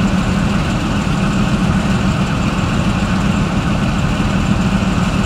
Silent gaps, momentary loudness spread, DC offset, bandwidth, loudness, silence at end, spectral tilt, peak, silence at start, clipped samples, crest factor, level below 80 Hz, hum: none; 1 LU; under 0.1%; 12.5 kHz; -16 LUFS; 0 s; -6 dB/octave; -2 dBFS; 0 s; under 0.1%; 12 dB; -24 dBFS; none